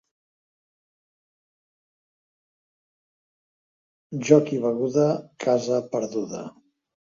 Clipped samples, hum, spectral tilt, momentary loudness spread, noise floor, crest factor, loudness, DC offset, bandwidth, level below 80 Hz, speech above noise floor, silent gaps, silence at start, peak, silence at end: under 0.1%; none; -6.5 dB/octave; 16 LU; under -90 dBFS; 26 dB; -23 LUFS; under 0.1%; 7.6 kHz; -72 dBFS; over 67 dB; none; 4.1 s; -2 dBFS; 0.55 s